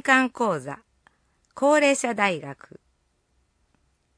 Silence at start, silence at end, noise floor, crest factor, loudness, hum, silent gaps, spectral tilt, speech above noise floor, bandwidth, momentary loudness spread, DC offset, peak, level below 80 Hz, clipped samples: 0.05 s; 1.65 s; -69 dBFS; 22 dB; -22 LUFS; none; none; -3.5 dB/octave; 46 dB; 10.5 kHz; 21 LU; under 0.1%; -4 dBFS; -70 dBFS; under 0.1%